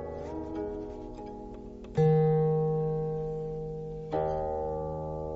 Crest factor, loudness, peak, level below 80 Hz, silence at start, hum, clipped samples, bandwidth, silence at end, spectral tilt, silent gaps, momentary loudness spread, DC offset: 16 dB; -31 LUFS; -14 dBFS; -48 dBFS; 0 s; none; under 0.1%; 6.2 kHz; 0 s; -10 dB/octave; none; 17 LU; under 0.1%